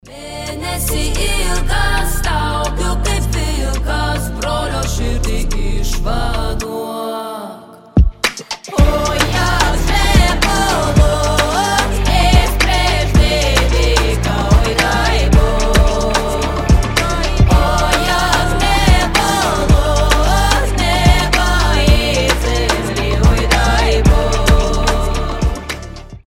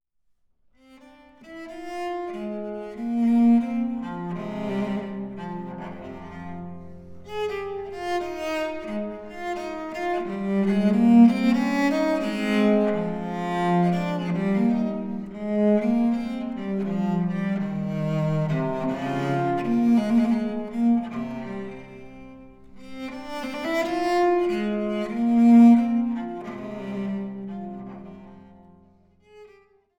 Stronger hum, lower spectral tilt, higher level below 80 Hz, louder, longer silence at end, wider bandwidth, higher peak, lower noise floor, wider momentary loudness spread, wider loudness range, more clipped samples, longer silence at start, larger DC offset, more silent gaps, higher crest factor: neither; second, -4.5 dB/octave vs -7.5 dB/octave; first, -16 dBFS vs -56 dBFS; first, -15 LUFS vs -24 LUFS; second, 0.1 s vs 0.55 s; first, 16.5 kHz vs 8.6 kHz; first, 0 dBFS vs -6 dBFS; second, -34 dBFS vs -67 dBFS; second, 8 LU vs 18 LU; second, 6 LU vs 12 LU; neither; second, 0.05 s vs 1.4 s; neither; neither; about the same, 14 dB vs 18 dB